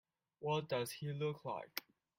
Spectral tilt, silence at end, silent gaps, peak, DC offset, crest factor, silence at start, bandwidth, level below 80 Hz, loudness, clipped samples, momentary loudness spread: -5 dB/octave; 0.35 s; none; -18 dBFS; under 0.1%; 24 dB; 0.4 s; 16.5 kHz; -80 dBFS; -42 LUFS; under 0.1%; 9 LU